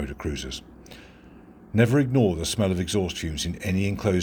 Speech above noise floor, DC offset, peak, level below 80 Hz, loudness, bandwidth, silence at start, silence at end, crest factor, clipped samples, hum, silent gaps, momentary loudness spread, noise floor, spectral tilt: 25 dB; under 0.1%; -6 dBFS; -42 dBFS; -25 LUFS; 19.5 kHz; 0 s; 0 s; 20 dB; under 0.1%; none; none; 17 LU; -48 dBFS; -5.5 dB/octave